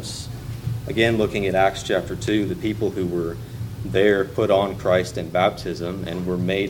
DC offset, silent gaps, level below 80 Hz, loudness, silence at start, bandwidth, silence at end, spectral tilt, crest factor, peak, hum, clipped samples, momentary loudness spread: under 0.1%; none; -44 dBFS; -22 LUFS; 0 s; 19 kHz; 0 s; -6 dB/octave; 18 dB; -4 dBFS; none; under 0.1%; 11 LU